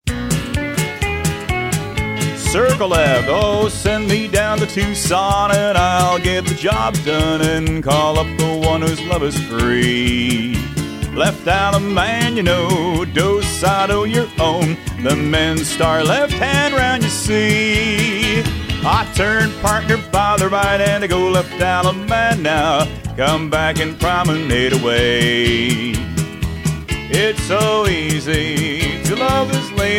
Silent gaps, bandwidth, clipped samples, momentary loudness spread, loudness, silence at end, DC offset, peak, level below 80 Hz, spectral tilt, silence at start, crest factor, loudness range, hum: none; 16.5 kHz; under 0.1%; 6 LU; -16 LUFS; 0 s; under 0.1%; 0 dBFS; -30 dBFS; -4.5 dB/octave; 0.05 s; 16 dB; 2 LU; none